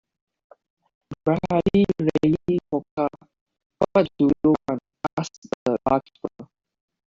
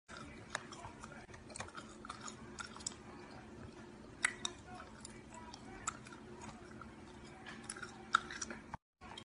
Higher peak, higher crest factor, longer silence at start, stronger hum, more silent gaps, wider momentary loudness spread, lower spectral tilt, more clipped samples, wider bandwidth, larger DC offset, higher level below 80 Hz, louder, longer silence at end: first, -4 dBFS vs -14 dBFS; second, 20 dB vs 34 dB; first, 1.1 s vs 0.1 s; neither; first, 2.91-2.97 s, 3.41-3.46 s, 3.66-3.70 s, 5.13-5.17 s, 5.38-5.42 s, 5.54-5.66 s vs 8.82-8.93 s; second, 11 LU vs 16 LU; first, -8 dB/octave vs -2 dB/octave; neither; second, 7.4 kHz vs 10.5 kHz; neither; first, -52 dBFS vs -66 dBFS; first, -23 LUFS vs -46 LUFS; first, 0.65 s vs 0 s